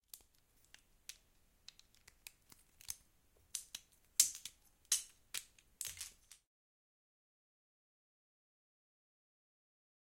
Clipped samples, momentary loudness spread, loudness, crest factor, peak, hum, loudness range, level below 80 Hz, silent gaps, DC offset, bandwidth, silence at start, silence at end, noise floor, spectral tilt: under 0.1%; 27 LU; -40 LUFS; 38 dB; -10 dBFS; none; 16 LU; -76 dBFS; none; under 0.1%; 16.5 kHz; 0.15 s; 3.75 s; -72 dBFS; 3 dB/octave